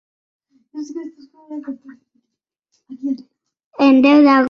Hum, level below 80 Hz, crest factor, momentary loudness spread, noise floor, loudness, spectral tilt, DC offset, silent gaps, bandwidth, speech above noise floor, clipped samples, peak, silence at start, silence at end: none; -64 dBFS; 16 dB; 26 LU; -79 dBFS; -14 LUFS; -5.5 dB/octave; under 0.1%; 3.64-3.71 s; 6.6 kHz; 63 dB; under 0.1%; -2 dBFS; 0.75 s; 0 s